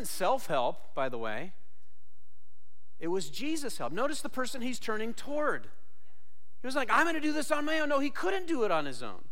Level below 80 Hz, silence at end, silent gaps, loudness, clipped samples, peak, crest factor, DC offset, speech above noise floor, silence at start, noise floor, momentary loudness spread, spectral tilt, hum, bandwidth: -66 dBFS; 0.1 s; none; -32 LUFS; under 0.1%; -14 dBFS; 18 dB; 3%; 39 dB; 0 s; -71 dBFS; 10 LU; -3.5 dB/octave; none; 16.5 kHz